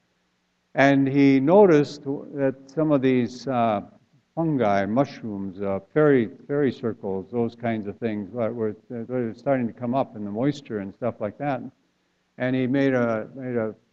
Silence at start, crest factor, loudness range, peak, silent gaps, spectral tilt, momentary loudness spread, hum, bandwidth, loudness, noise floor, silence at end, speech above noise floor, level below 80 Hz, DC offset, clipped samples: 0.75 s; 20 dB; 7 LU; -2 dBFS; none; -8 dB/octave; 12 LU; none; 7.4 kHz; -24 LUFS; -70 dBFS; 0.2 s; 47 dB; -64 dBFS; under 0.1%; under 0.1%